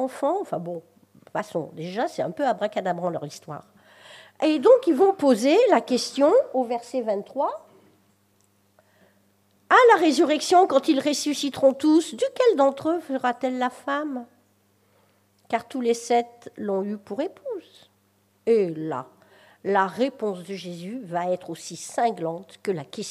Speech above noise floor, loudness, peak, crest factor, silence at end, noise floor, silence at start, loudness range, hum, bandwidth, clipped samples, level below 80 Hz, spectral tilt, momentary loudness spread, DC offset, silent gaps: 42 dB; -23 LUFS; -4 dBFS; 20 dB; 0 s; -65 dBFS; 0 s; 9 LU; none; 15 kHz; under 0.1%; -78 dBFS; -4.5 dB/octave; 16 LU; under 0.1%; none